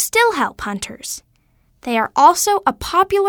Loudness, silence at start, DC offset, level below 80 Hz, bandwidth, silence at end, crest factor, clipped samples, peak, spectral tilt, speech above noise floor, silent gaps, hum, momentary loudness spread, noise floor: -16 LUFS; 0 s; under 0.1%; -46 dBFS; over 20 kHz; 0 s; 18 dB; under 0.1%; 0 dBFS; -2 dB/octave; 42 dB; none; none; 16 LU; -58 dBFS